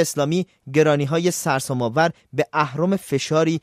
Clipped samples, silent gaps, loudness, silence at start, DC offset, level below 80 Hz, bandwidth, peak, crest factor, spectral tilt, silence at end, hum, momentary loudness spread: under 0.1%; none; -21 LUFS; 0 s; under 0.1%; -62 dBFS; 16 kHz; -4 dBFS; 16 dB; -5 dB/octave; 0.05 s; none; 5 LU